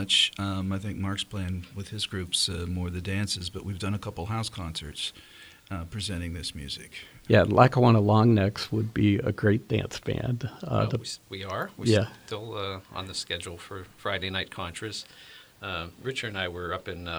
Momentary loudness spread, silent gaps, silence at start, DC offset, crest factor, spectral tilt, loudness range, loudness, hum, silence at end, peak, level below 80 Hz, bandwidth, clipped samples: 16 LU; none; 0 s; under 0.1%; 24 dB; -5 dB/octave; 11 LU; -28 LUFS; none; 0 s; -4 dBFS; -52 dBFS; over 20 kHz; under 0.1%